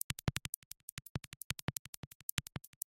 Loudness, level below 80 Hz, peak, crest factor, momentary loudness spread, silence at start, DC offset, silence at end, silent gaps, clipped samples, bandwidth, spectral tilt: -43 LUFS; -58 dBFS; -10 dBFS; 34 dB; 9 LU; 0.1 s; under 0.1%; 0.3 s; 0.49-0.71 s, 0.83-0.97 s, 1.09-1.15 s, 1.27-1.31 s, 1.44-1.50 s, 1.62-1.68 s, 1.79-2.37 s; under 0.1%; 17 kHz; -3 dB/octave